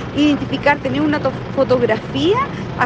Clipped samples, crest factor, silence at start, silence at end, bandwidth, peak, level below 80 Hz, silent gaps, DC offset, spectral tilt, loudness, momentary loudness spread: under 0.1%; 16 dB; 0 s; 0 s; 8 kHz; -2 dBFS; -42 dBFS; none; under 0.1%; -6.5 dB/octave; -17 LUFS; 4 LU